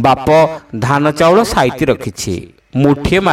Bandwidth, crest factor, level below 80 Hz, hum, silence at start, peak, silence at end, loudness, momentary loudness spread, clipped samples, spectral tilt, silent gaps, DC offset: 16.5 kHz; 12 dB; -34 dBFS; none; 0 s; 0 dBFS; 0 s; -13 LUFS; 11 LU; under 0.1%; -5.5 dB/octave; none; under 0.1%